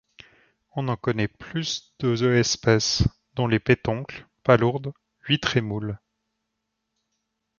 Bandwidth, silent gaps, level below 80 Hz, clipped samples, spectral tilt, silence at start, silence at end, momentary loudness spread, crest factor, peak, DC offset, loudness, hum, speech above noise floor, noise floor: 7.2 kHz; none; -46 dBFS; under 0.1%; -5 dB/octave; 0.75 s; 1.65 s; 13 LU; 22 dB; -2 dBFS; under 0.1%; -24 LUFS; none; 57 dB; -80 dBFS